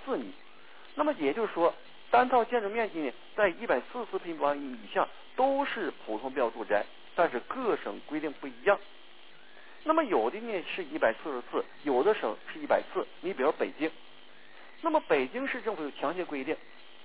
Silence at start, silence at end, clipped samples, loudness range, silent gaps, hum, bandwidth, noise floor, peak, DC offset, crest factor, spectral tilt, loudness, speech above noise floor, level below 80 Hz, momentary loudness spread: 0 s; 0.4 s; under 0.1%; 3 LU; none; none; 4 kHz; -56 dBFS; -12 dBFS; 0.4%; 20 dB; -2 dB/octave; -31 LUFS; 25 dB; -72 dBFS; 10 LU